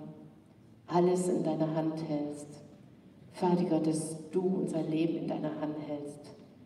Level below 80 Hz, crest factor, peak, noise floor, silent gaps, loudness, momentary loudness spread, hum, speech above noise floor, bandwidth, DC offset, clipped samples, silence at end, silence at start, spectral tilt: -76 dBFS; 18 dB; -16 dBFS; -58 dBFS; none; -32 LUFS; 21 LU; none; 26 dB; 12.5 kHz; under 0.1%; under 0.1%; 0 s; 0 s; -7 dB/octave